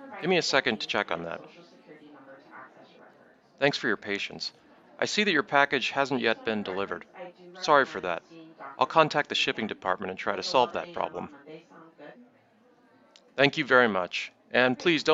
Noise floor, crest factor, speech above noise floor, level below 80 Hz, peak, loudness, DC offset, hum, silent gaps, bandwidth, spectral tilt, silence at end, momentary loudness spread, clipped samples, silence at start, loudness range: -62 dBFS; 26 dB; 35 dB; -72 dBFS; -4 dBFS; -27 LUFS; under 0.1%; none; none; 8 kHz; -4 dB/octave; 0 s; 16 LU; under 0.1%; 0 s; 7 LU